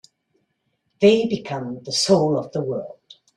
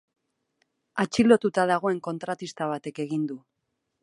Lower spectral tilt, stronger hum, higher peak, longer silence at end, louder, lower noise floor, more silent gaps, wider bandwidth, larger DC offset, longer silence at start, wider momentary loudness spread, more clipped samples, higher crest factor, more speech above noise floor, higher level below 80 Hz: about the same, -5 dB/octave vs -5.5 dB/octave; neither; about the same, -4 dBFS vs -4 dBFS; second, 0.45 s vs 0.65 s; first, -20 LUFS vs -26 LUFS; second, -72 dBFS vs -79 dBFS; neither; about the same, 12.5 kHz vs 11.5 kHz; neither; about the same, 1 s vs 0.95 s; about the same, 13 LU vs 14 LU; neither; about the same, 18 dB vs 22 dB; about the same, 52 dB vs 54 dB; about the same, -62 dBFS vs -66 dBFS